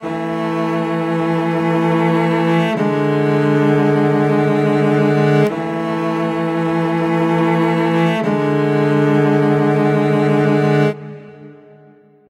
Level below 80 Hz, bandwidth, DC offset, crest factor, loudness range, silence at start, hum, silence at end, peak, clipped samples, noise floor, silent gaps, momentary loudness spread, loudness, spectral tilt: -60 dBFS; 11 kHz; under 0.1%; 14 dB; 2 LU; 0 s; none; 0.75 s; -2 dBFS; under 0.1%; -47 dBFS; none; 5 LU; -16 LUFS; -8 dB/octave